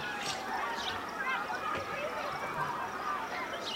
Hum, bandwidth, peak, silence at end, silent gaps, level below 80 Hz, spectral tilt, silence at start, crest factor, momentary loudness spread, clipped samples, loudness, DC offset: none; 16 kHz; -22 dBFS; 0 s; none; -64 dBFS; -2.5 dB/octave; 0 s; 14 dB; 2 LU; under 0.1%; -35 LUFS; under 0.1%